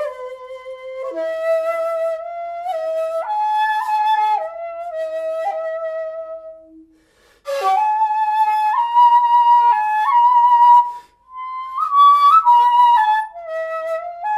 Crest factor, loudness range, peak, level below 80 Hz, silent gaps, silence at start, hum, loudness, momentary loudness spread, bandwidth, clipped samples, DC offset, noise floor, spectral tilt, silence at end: 14 dB; 10 LU; -4 dBFS; -66 dBFS; none; 0 s; none; -16 LUFS; 18 LU; 13.5 kHz; under 0.1%; under 0.1%; -55 dBFS; -1 dB/octave; 0 s